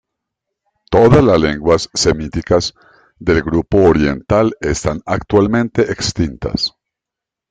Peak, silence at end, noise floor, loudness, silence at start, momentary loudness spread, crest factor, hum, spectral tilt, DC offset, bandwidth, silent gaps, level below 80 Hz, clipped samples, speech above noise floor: 0 dBFS; 0.8 s; -84 dBFS; -15 LUFS; 0.9 s; 10 LU; 14 dB; none; -5.5 dB/octave; under 0.1%; 9.6 kHz; none; -34 dBFS; under 0.1%; 71 dB